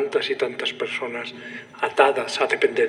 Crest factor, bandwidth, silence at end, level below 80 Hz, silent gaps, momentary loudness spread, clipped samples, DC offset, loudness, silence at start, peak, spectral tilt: 22 dB; 12 kHz; 0 s; -78 dBFS; none; 14 LU; under 0.1%; under 0.1%; -23 LUFS; 0 s; -2 dBFS; -3 dB/octave